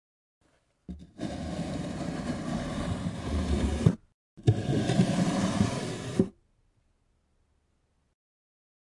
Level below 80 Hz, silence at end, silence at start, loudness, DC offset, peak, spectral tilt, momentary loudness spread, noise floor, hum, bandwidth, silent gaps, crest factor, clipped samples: -44 dBFS; 2.7 s; 0.9 s; -30 LUFS; under 0.1%; -8 dBFS; -6.5 dB/octave; 11 LU; -72 dBFS; none; 11.5 kHz; 4.14-4.37 s; 22 dB; under 0.1%